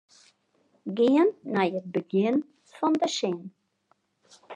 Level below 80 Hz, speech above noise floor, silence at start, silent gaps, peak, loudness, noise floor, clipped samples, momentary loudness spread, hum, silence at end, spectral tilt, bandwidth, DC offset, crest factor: -84 dBFS; 45 dB; 0.85 s; none; -10 dBFS; -26 LUFS; -70 dBFS; under 0.1%; 16 LU; none; 0 s; -5.5 dB/octave; 10 kHz; under 0.1%; 16 dB